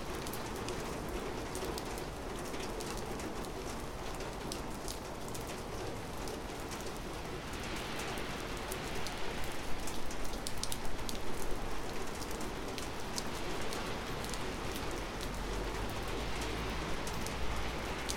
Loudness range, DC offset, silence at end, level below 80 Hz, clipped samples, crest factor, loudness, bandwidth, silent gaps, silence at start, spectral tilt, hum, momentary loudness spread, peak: 3 LU; under 0.1%; 0 s; -46 dBFS; under 0.1%; 24 dB; -40 LUFS; 17 kHz; none; 0 s; -4 dB/octave; none; 3 LU; -14 dBFS